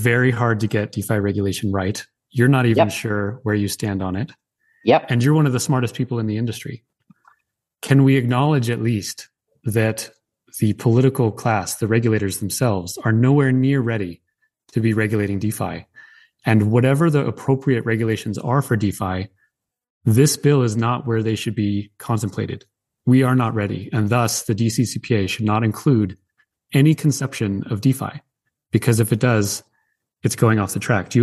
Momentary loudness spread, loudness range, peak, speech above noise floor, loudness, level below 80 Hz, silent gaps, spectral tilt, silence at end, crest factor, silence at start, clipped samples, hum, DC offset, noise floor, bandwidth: 11 LU; 2 LU; -2 dBFS; 51 dB; -20 LUFS; -58 dBFS; 19.90-20.01 s; -6 dB/octave; 0 s; 16 dB; 0 s; under 0.1%; none; under 0.1%; -70 dBFS; 12.5 kHz